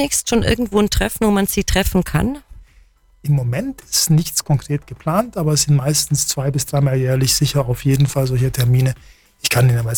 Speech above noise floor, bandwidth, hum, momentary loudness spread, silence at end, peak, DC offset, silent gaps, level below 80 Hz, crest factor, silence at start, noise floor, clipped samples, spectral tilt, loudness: 34 dB; 19 kHz; none; 6 LU; 0 s; -4 dBFS; under 0.1%; none; -32 dBFS; 12 dB; 0 s; -51 dBFS; under 0.1%; -4.5 dB/octave; -17 LUFS